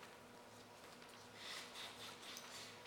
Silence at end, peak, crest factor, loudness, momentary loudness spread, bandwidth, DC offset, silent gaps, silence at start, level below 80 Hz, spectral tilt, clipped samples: 0 s; -36 dBFS; 20 dB; -53 LUFS; 10 LU; 19 kHz; under 0.1%; none; 0 s; -84 dBFS; -1.5 dB/octave; under 0.1%